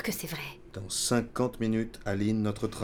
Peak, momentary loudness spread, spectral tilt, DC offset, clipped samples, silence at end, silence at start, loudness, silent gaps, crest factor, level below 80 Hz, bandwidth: -14 dBFS; 10 LU; -4.5 dB/octave; under 0.1%; under 0.1%; 0 s; 0 s; -31 LUFS; none; 16 dB; -52 dBFS; over 20 kHz